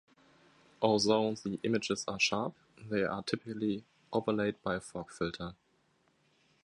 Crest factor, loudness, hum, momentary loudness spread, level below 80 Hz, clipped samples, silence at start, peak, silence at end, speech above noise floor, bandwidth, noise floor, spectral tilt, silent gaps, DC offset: 22 dB; -33 LUFS; none; 12 LU; -66 dBFS; under 0.1%; 0.8 s; -12 dBFS; 1.15 s; 39 dB; 11.5 kHz; -72 dBFS; -4.5 dB/octave; none; under 0.1%